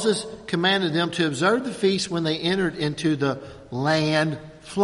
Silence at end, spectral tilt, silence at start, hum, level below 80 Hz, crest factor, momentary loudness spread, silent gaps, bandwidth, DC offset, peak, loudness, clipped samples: 0 s; -5 dB/octave; 0 s; none; -56 dBFS; 18 dB; 8 LU; none; 11.5 kHz; under 0.1%; -6 dBFS; -23 LUFS; under 0.1%